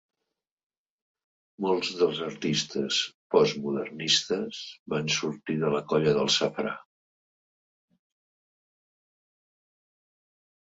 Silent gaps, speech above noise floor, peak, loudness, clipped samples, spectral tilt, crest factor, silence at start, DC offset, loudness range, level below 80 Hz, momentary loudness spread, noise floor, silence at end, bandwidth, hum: 3.14-3.30 s, 4.79-4.86 s; 58 dB; -6 dBFS; -27 LUFS; under 0.1%; -3.5 dB/octave; 24 dB; 1.6 s; under 0.1%; 4 LU; -70 dBFS; 9 LU; -86 dBFS; 3.85 s; 8 kHz; none